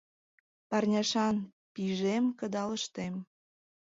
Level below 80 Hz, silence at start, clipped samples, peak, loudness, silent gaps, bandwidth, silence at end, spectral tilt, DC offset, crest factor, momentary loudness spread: -72 dBFS; 0.7 s; under 0.1%; -18 dBFS; -32 LUFS; 1.53-1.75 s; 7.8 kHz; 0.75 s; -5 dB/octave; under 0.1%; 16 dB; 10 LU